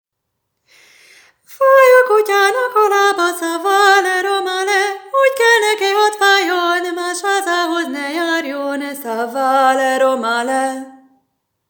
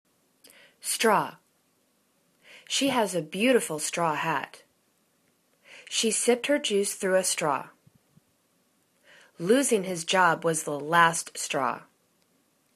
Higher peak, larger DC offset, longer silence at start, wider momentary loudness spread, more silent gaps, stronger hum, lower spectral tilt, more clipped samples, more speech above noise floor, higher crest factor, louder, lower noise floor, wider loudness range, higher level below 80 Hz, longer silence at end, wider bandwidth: first, 0 dBFS vs -6 dBFS; neither; first, 1.5 s vs 0.85 s; about the same, 10 LU vs 9 LU; neither; neither; second, -0.5 dB/octave vs -2.5 dB/octave; neither; first, 59 dB vs 44 dB; second, 16 dB vs 22 dB; first, -14 LUFS vs -26 LUFS; first, -75 dBFS vs -69 dBFS; about the same, 5 LU vs 3 LU; second, -84 dBFS vs -76 dBFS; second, 0.8 s vs 0.95 s; first, over 20 kHz vs 14 kHz